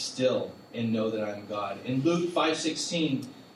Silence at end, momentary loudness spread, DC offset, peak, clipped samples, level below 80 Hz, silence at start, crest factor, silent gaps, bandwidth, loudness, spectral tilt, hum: 0.05 s; 8 LU; under 0.1%; -14 dBFS; under 0.1%; -74 dBFS; 0 s; 16 dB; none; 12.5 kHz; -29 LUFS; -4.5 dB/octave; none